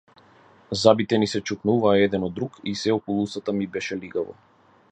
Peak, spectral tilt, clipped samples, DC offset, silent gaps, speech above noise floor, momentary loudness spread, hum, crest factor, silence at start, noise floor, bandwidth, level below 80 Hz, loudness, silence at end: -2 dBFS; -5.5 dB/octave; under 0.1%; under 0.1%; none; 31 dB; 12 LU; none; 22 dB; 0.7 s; -54 dBFS; 9.2 kHz; -56 dBFS; -23 LUFS; 0.6 s